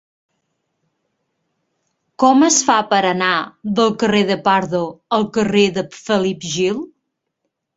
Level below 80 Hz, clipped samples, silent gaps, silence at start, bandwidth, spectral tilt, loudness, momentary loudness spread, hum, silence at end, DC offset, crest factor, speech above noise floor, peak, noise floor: -58 dBFS; under 0.1%; none; 2.2 s; 8 kHz; -3.5 dB/octave; -16 LUFS; 10 LU; none; 0.9 s; under 0.1%; 18 dB; 59 dB; 0 dBFS; -75 dBFS